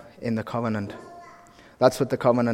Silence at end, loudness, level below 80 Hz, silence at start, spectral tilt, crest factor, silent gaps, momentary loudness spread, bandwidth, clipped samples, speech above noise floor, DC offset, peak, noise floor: 0 s; -25 LUFS; -60 dBFS; 0 s; -6.5 dB/octave; 22 dB; none; 21 LU; 16.5 kHz; under 0.1%; 27 dB; under 0.1%; -2 dBFS; -50 dBFS